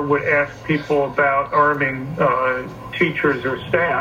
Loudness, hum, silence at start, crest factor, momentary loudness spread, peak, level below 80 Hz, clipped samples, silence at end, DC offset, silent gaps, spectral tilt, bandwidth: -19 LUFS; none; 0 s; 16 dB; 6 LU; -4 dBFS; -48 dBFS; under 0.1%; 0 s; under 0.1%; none; -7 dB/octave; 16 kHz